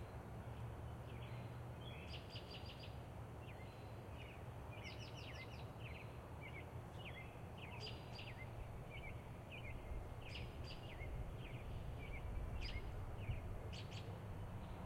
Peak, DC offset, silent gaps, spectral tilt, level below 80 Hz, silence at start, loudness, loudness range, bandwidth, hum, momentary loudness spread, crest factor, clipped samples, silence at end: -34 dBFS; under 0.1%; none; -6 dB/octave; -56 dBFS; 0 s; -52 LUFS; 3 LU; 16 kHz; none; 4 LU; 16 dB; under 0.1%; 0 s